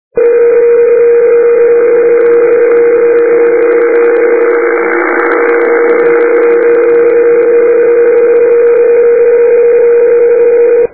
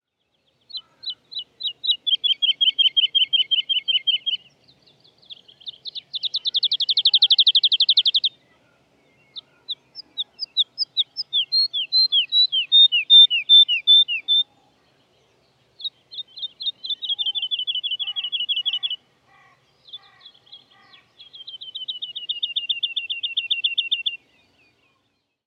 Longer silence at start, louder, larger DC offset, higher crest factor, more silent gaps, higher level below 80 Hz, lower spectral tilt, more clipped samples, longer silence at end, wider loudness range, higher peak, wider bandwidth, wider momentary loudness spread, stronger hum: second, 0.15 s vs 0.75 s; first, -6 LUFS vs -17 LUFS; first, 1% vs under 0.1%; second, 6 dB vs 18 dB; neither; first, -58 dBFS vs -82 dBFS; first, -9.5 dB/octave vs 1 dB/octave; first, 0.2% vs under 0.1%; second, 0.05 s vs 1.3 s; second, 2 LU vs 14 LU; first, 0 dBFS vs -4 dBFS; second, 2.6 kHz vs 7.8 kHz; second, 2 LU vs 20 LU; neither